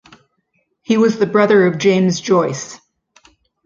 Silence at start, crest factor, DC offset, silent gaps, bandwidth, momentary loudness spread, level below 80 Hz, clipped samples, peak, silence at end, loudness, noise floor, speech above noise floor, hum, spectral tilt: 0.9 s; 14 dB; under 0.1%; none; 7.6 kHz; 10 LU; -60 dBFS; under 0.1%; -2 dBFS; 0.9 s; -14 LUFS; -66 dBFS; 52 dB; none; -5.5 dB/octave